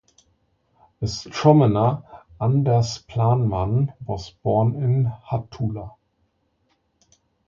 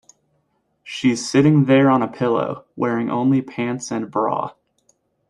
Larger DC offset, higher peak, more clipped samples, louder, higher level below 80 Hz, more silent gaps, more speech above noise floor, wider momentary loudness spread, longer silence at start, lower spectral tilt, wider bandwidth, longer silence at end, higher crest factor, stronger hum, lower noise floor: neither; about the same, -2 dBFS vs -4 dBFS; neither; second, -22 LUFS vs -19 LUFS; first, -46 dBFS vs -60 dBFS; neither; about the same, 48 dB vs 49 dB; first, 14 LU vs 11 LU; first, 1 s vs 0.85 s; about the same, -7.5 dB/octave vs -6.5 dB/octave; second, 7.4 kHz vs 11 kHz; first, 1.6 s vs 0.8 s; first, 22 dB vs 16 dB; neither; about the same, -69 dBFS vs -68 dBFS